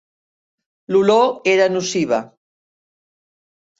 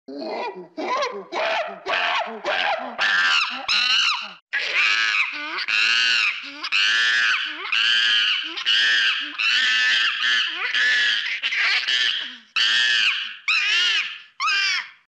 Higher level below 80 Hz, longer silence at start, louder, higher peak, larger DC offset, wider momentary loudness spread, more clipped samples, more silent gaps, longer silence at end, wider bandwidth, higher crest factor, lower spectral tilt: first, -64 dBFS vs -74 dBFS; first, 0.9 s vs 0.1 s; about the same, -17 LUFS vs -19 LUFS; first, -2 dBFS vs -8 dBFS; neither; second, 6 LU vs 10 LU; neither; second, none vs 4.42-4.47 s; first, 1.55 s vs 0.15 s; second, 8 kHz vs 12 kHz; about the same, 18 dB vs 14 dB; first, -4.5 dB/octave vs 1 dB/octave